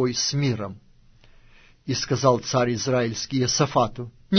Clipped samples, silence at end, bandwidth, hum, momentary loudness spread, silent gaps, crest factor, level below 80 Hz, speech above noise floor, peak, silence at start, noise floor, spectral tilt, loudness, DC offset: under 0.1%; 0 s; 6.6 kHz; none; 10 LU; none; 20 dB; -52 dBFS; 29 dB; -4 dBFS; 0 s; -52 dBFS; -4.5 dB/octave; -23 LUFS; under 0.1%